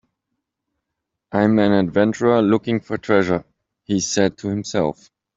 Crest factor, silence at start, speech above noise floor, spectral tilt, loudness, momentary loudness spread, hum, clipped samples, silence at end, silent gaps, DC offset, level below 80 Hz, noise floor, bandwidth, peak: 18 dB; 1.3 s; 62 dB; -5.5 dB/octave; -19 LUFS; 9 LU; none; under 0.1%; 0.45 s; none; under 0.1%; -56 dBFS; -80 dBFS; 7.8 kHz; -2 dBFS